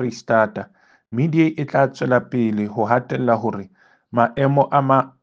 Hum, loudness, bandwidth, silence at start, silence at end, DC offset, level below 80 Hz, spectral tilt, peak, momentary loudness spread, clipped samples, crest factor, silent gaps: none; -19 LUFS; 7.4 kHz; 0 s; 0.15 s; under 0.1%; -62 dBFS; -8 dB/octave; 0 dBFS; 9 LU; under 0.1%; 18 dB; none